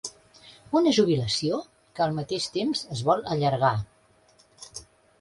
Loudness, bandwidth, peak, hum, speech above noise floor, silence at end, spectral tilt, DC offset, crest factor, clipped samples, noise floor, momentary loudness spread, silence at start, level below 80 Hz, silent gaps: -25 LUFS; 11.5 kHz; -8 dBFS; none; 36 dB; 0.4 s; -5.5 dB/octave; under 0.1%; 20 dB; under 0.1%; -60 dBFS; 20 LU; 0.05 s; -58 dBFS; none